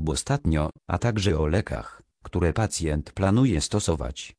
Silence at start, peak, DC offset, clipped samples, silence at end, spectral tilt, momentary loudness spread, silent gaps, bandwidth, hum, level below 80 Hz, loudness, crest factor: 0 s; -8 dBFS; under 0.1%; under 0.1%; 0.05 s; -5.5 dB/octave; 9 LU; none; 11 kHz; none; -36 dBFS; -25 LUFS; 16 dB